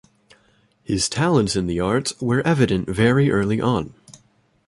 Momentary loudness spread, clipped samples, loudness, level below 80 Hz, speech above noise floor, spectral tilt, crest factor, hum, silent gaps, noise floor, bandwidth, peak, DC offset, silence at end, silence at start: 5 LU; under 0.1%; -20 LUFS; -44 dBFS; 41 dB; -5.5 dB/octave; 18 dB; none; none; -60 dBFS; 11.5 kHz; -2 dBFS; under 0.1%; 0.55 s; 0.9 s